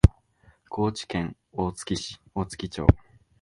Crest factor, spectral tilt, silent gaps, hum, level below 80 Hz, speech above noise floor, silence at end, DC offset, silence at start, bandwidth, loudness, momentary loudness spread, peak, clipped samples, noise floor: 26 dB; -6.5 dB/octave; none; none; -34 dBFS; 34 dB; 0.45 s; under 0.1%; 0.05 s; 11.5 kHz; -28 LUFS; 11 LU; 0 dBFS; under 0.1%; -60 dBFS